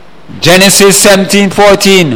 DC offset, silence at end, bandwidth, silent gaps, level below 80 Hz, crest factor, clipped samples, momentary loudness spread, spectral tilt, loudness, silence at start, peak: 5%; 0 s; over 20 kHz; none; -34 dBFS; 6 dB; 6%; 5 LU; -3 dB/octave; -4 LUFS; 0.3 s; 0 dBFS